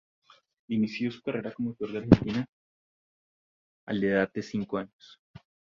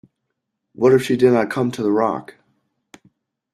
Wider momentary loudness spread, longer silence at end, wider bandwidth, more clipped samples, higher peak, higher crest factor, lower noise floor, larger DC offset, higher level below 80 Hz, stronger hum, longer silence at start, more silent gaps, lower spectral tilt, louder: first, 12 LU vs 7 LU; second, 0.9 s vs 1.3 s; second, 7.4 kHz vs 13.5 kHz; neither; about the same, -2 dBFS vs -2 dBFS; first, 28 dB vs 18 dB; first, under -90 dBFS vs -77 dBFS; neither; first, -52 dBFS vs -60 dBFS; neither; about the same, 0.7 s vs 0.8 s; first, 2.49-3.87 s vs none; first, -8 dB/octave vs -6.5 dB/octave; second, -29 LUFS vs -18 LUFS